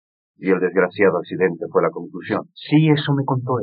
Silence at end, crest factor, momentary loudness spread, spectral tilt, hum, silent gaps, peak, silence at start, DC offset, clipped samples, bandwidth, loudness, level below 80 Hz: 0 s; 16 dB; 9 LU; -6 dB/octave; none; none; -4 dBFS; 0.4 s; under 0.1%; under 0.1%; 4.9 kHz; -20 LUFS; -76 dBFS